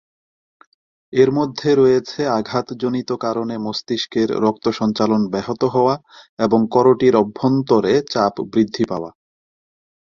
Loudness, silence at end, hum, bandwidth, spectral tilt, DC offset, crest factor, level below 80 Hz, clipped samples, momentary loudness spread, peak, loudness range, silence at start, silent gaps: -18 LUFS; 0.95 s; none; 7.2 kHz; -6.5 dB/octave; under 0.1%; 16 dB; -56 dBFS; under 0.1%; 9 LU; -2 dBFS; 3 LU; 1.1 s; 6.29-6.37 s